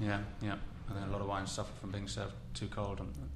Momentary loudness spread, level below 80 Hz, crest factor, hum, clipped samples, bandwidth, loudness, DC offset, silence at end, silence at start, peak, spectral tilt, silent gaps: 6 LU; -48 dBFS; 20 dB; none; under 0.1%; 13 kHz; -41 LUFS; under 0.1%; 0 s; 0 s; -20 dBFS; -5.5 dB/octave; none